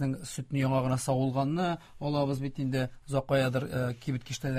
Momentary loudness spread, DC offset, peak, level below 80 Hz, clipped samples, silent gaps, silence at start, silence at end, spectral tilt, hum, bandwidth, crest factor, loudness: 7 LU; under 0.1%; -14 dBFS; -56 dBFS; under 0.1%; none; 0 s; 0 s; -6.5 dB/octave; none; 15.5 kHz; 16 dB; -31 LUFS